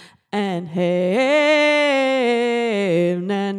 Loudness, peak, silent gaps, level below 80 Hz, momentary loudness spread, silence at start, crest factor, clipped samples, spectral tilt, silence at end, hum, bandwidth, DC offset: -18 LUFS; -8 dBFS; none; -78 dBFS; 9 LU; 0 s; 12 dB; under 0.1%; -5.5 dB/octave; 0 s; none; 11.5 kHz; under 0.1%